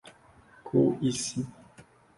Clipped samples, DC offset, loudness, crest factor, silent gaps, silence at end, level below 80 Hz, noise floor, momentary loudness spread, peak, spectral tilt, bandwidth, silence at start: under 0.1%; under 0.1%; -29 LUFS; 20 dB; none; 0.35 s; -64 dBFS; -57 dBFS; 15 LU; -10 dBFS; -5.5 dB/octave; 11.5 kHz; 0.05 s